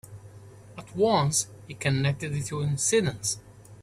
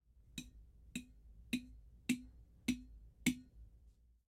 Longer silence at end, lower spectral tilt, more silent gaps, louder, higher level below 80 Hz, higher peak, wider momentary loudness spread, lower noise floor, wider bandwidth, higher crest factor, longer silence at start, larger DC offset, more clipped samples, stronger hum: second, 0 s vs 0.4 s; about the same, -4 dB/octave vs -3.5 dB/octave; neither; first, -26 LUFS vs -44 LUFS; first, -56 dBFS vs -62 dBFS; first, -10 dBFS vs -20 dBFS; about the same, 21 LU vs 23 LU; second, -48 dBFS vs -67 dBFS; second, 14 kHz vs 16 kHz; second, 18 dB vs 26 dB; second, 0.05 s vs 0.3 s; neither; neither; neither